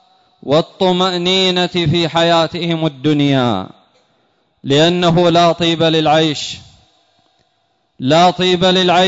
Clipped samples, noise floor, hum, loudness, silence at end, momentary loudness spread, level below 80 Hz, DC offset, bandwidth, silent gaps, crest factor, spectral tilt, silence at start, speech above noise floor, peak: under 0.1%; -63 dBFS; none; -13 LUFS; 0 s; 11 LU; -48 dBFS; under 0.1%; 8 kHz; none; 12 dB; -5.5 dB/octave; 0.45 s; 49 dB; -2 dBFS